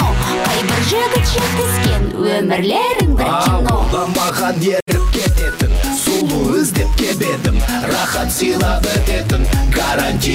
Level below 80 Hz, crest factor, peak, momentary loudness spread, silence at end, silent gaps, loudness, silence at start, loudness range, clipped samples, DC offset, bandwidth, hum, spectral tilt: -20 dBFS; 10 dB; -4 dBFS; 2 LU; 0 s; 4.82-4.86 s; -15 LUFS; 0 s; 1 LU; under 0.1%; under 0.1%; 16.5 kHz; none; -4.5 dB/octave